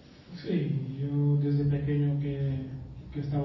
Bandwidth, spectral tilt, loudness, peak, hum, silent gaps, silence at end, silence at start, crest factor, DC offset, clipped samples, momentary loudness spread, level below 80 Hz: 5.8 kHz; -10.5 dB/octave; -29 LUFS; -18 dBFS; none; none; 0 s; 0.05 s; 12 dB; under 0.1%; under 0.1%; 14 LU; -50 dBFS